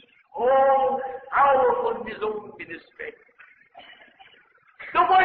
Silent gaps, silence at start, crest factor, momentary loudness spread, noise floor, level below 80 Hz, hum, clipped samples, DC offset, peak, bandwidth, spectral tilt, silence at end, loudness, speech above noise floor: none; 0.35 s; 16 dB; 20 LU; -58 dBFS; -62 dBFS; none; under 0.1%; under 0.1%; -8 dBFS; 4.7 kHz; -7.5 dB/octave; 0 s; -22 LUFS; 34 dB